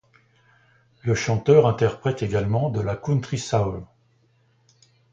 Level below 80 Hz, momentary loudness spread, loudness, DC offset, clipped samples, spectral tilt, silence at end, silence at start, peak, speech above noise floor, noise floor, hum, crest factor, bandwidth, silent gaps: -48 dBFS; 10 LU; -22 LUFS; under 0.1%; under 0.1%; -6.5 dB/octave; 1.3 s; 1.05 s; -2 dBFS; 41 dB; -62 dBFS; none; 20 dB; 8 kHz; none